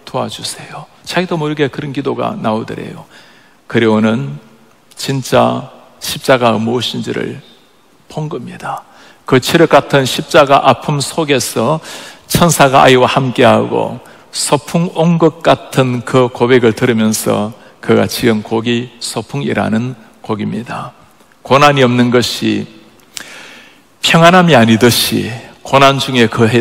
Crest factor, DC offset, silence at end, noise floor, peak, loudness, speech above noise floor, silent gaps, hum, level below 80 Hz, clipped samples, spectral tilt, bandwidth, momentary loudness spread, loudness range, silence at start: 12 dB; 0.2%; 0 s; -49 dBFS; 0 dBFS; -12 LUFS; 37 dB; none; none; -46 dBFS; 1%; -5 dB/octave; 16.5 kHz; 18 LU; 7 LU; 0.05 s